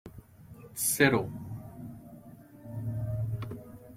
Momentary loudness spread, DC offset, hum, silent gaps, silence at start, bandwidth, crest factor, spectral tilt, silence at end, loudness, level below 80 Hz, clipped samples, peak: 26 LU; under 0.1%; none; none; 0.05 s; 16.5 kHz; 26 dB; -4.5 dB/octave; 0 s; -30 LUFS; -56 dBFS; under 0.1%; -8 dBFS